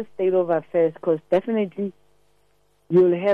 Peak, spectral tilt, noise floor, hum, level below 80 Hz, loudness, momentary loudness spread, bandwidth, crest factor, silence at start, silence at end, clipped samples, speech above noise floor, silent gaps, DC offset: -8 dBFS; -9.5 dB/octave; -65 dBFS; 50 Hz at -65 dBFS; -68 dBFS; -22 LUFS; 9 LU; 4.2 kHz; 14 dB; 0 s; 0 s; under 0.1%; 44 dB; none; under 0.1%